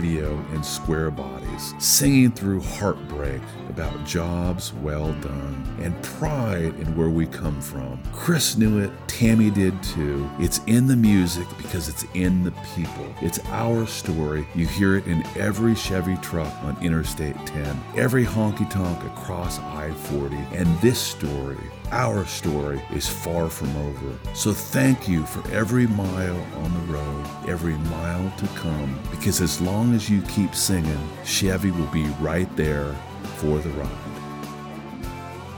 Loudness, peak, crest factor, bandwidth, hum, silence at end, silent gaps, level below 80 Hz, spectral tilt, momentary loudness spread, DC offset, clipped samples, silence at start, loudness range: -24 LUFS; -4 dBFS; 20 dB; over 20 kHz; none; 0 s; none; -38 dBFS; -5 dB/octave; 11 LU; under 0.1%; under 0.1%; 0 s; 5 LU